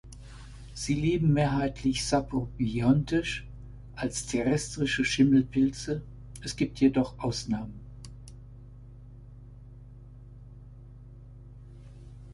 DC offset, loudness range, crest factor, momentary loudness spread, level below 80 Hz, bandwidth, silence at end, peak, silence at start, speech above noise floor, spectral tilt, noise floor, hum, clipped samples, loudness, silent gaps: under 0.1%; 22 LU; 20 dB; 25 LU; -46 dBFS; 11.5 kHz; 0 s; -10 dBFS; 0.05 s; 21 dB; -5.5 dB/octave; -48 dBFS; 50 Hz at -45 dBFS; under 0.1%; -28 LUFS; none